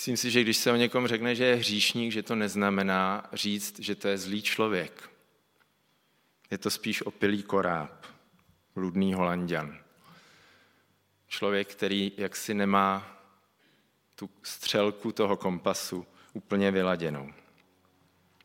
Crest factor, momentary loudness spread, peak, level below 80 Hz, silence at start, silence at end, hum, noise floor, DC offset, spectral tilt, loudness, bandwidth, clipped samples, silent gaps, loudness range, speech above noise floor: 22 dB; 15 LU; -8 dBFS; -74 dBFS; 0 s; 1.1 s; none; -70 dBFS; under 0.1%; -4 dB/octave; -29 LUFS; 16.5 kHz; under 0.1%; none; 6 LU; 41 dB